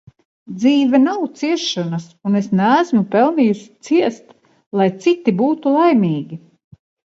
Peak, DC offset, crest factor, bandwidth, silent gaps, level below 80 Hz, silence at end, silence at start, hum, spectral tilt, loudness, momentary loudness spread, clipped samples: -2 dBFS; under 0.1%; 16 dB; 7.8 kHz; 4.66-4.71 s; -66 dBFS; 0.8 s; 0.5 s; none; -6.5 dB/octave; -17 LUFS; 11 LU; under 0.1%